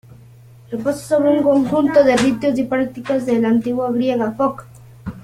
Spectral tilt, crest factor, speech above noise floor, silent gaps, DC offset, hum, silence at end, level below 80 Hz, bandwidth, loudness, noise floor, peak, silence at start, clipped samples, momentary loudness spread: -6 dB/octave; 16 dB; 27 dB; none; under 0.1%; none; 0.05 s; -50 dBFS; 15 kHz; -17 LUFS; -43 dBFS; -2 dBFS; 0.1 s; under 0.1%; 10 LU